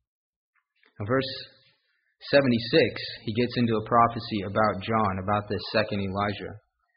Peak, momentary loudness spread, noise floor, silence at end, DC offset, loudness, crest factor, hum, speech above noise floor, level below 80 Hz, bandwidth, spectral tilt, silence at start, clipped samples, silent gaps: -6 dBFS; 14 LU; -71 dBFS; 0.4 s; under 0.1%; -26 LUFS; 20 dB; none; 46 dB; -58 dBFS; 5.4 kHz; -4 dB/octave; 1 s; under 0.1%; none